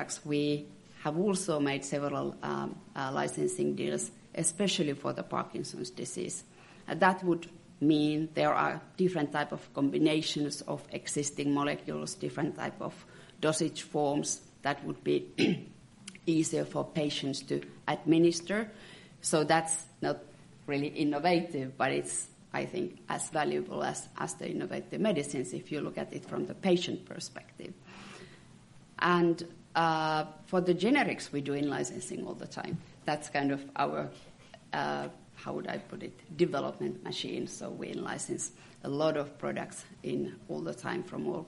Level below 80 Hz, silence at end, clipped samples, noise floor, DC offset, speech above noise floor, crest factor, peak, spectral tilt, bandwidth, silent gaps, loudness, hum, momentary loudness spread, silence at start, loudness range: -70 dBFS; 0 s; under 0.1%; -56 dBFS; under 0.1%; 24 dB; 22 dB; -10 dBFS; -4.5 dB/octave; 11.5 kHz; none; -33 LUFS; none; 13 LU; 0 s; 6 LU